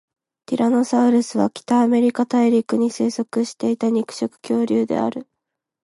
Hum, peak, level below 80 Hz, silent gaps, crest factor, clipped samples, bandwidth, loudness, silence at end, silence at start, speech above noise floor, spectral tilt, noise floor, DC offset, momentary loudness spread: none; -4 dBFS; -68 dBFS; none; 16 dB; under 0.1%; 11.5 kHz; -20 LUFS; 0.6 s; 0.5 s; 62 dB; -5.5 dB/octave; -81 dBFS; under 0.1%; 7 LU